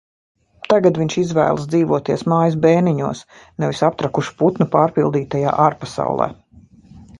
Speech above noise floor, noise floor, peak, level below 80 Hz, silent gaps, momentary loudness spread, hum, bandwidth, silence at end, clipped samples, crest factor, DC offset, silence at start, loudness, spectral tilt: 29 dB; -46 dBFS; 0 dBFS; -52 dBFS; none; 9 LU; none; 11 kHz; 0.05 s; under 0.1%; 18 dB; under 0.1%; 0.7 s; -18 LUFS; -7 dB/octave